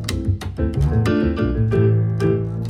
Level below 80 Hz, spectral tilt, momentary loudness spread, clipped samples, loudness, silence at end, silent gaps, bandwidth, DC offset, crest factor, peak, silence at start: -28 dBFS; -8 dB/octave; 6 LU; under 0.1%; -19 LUFS; 0 s; none; 12.5 kHz; under 0.1%; 12 dB; -6 dBFS; 0 s